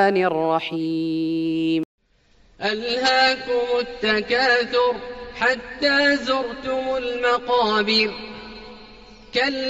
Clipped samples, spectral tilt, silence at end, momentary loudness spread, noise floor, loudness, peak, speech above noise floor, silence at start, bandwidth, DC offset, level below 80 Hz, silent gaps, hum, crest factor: under 0.1%; -4 dB/octave; 0 s; 11 LU; -57 dBFS; -21 LUFS; -6 dBFS; 36 dB; 0 s; 8 kHz; under 0.1%; -52 dBFS; 1.85-1.98 s; none; 16 dB